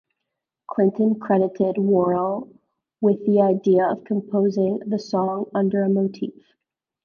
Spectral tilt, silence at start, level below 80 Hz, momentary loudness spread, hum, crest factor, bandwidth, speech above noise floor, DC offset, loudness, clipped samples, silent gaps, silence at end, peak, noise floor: -9 dB/octave; 0.7 s; -68 dBFS; 8 LU; none; 16 dB; 6.8 kHz; 62 dB; under 0.1%; -21 LUFS; under 0.1%; none; 0.75 s; -6 dBFS; -82 dBFS